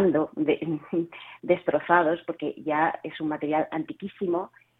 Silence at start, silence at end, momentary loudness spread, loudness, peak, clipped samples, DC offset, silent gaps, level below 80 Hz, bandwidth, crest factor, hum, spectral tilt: 0 s; 0.3 s; 11 LU; -27 LUFS; -4 dBFS; under 0.1%; under 0.1%; none; -66 dBFS; 4 kHz; 22 dB; none; -9 dB/octave